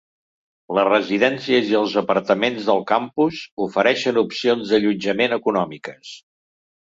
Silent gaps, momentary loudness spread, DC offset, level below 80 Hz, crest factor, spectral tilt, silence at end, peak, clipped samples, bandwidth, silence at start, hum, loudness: 3.52-3.57 s; 8 LU; under 0.1%; -62 dBFS; 18 dB; -5 dB/octave; 0.7 s; -2 dBFS; under 0.1%; 7.8 kHz; 0.7 s; none; -19 LUFS